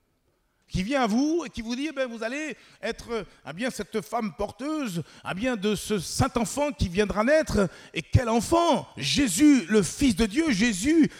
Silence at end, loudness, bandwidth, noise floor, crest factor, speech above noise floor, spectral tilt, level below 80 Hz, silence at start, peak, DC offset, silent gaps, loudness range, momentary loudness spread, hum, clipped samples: 0 s; -26 LUFS; 16 kHz; -70 dBFS; 18 dB; 45 dB; -5 dB/octave; -44 dBFS; 0.7 s; -8 dBFS; under 0.1%; none; 9 LU; 12 LU; none; under 0.1%